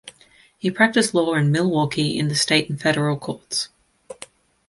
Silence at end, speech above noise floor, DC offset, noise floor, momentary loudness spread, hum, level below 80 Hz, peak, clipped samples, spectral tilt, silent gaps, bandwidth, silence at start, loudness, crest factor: 0.55 s; 34 dB; under 0.1%; -54 dBFS; 12 LU; none; -60 dBFS; -2 dBFS; under 0.1%; -4.5 dB/octave; none; 11.5 kHz; 0.05 s; -20 LUFS; 20 dB